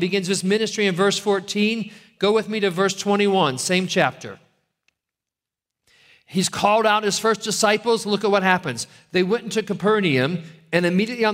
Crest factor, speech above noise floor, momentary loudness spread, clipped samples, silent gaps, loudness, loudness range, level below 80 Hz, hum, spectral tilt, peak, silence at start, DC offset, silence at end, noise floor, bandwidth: 20 dB; 67 dB; 7 LU; under 0.1%; none; -20 LUFS; 4 LU; -64 dBFS; none; -4 dB/octave; -2 dBFS; 0 s; under 0.1%; 0 s; -88 dBFS; 16 kHz